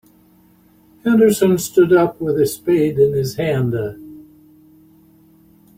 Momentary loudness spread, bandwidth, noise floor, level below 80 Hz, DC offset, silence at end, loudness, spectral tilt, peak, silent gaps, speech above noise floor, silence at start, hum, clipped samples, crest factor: 11 LU; 16.5 kHz; -52 dBFS; -52 dBFS; under 0.1%; 1.55 s; -16 LUFS; -6.5 dB/octave; -2 dBFS; none; 36 dB; 1.05 s; none; under 0.1%; 16 dB